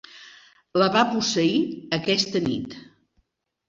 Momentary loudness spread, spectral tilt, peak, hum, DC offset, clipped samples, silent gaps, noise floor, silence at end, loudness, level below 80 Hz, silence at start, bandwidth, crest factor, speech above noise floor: 16 LU; -4 dB/octave; -4 dBFS; none; under 0.1%; under 0.1%; none; -70 dBFS; 0.85 s; -23 LUFS; -62 dBFS; 0.15 s; 7.8 kHz; 20 dB; 47 dB